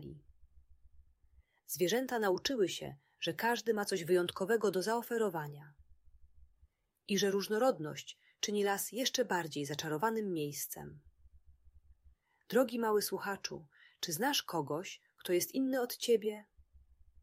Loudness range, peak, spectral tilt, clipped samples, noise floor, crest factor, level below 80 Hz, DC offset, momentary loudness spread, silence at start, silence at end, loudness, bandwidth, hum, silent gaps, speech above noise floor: 4 LU; -18 dBFS; -3.5 dB/octave; under 0.1%; -71 dBFS; 18 dB; -70 dBFS; under 0.1%; 13 LU; 0 s; 0.45 s; -35 LUFS; 16 kHz; none; none; 36 dB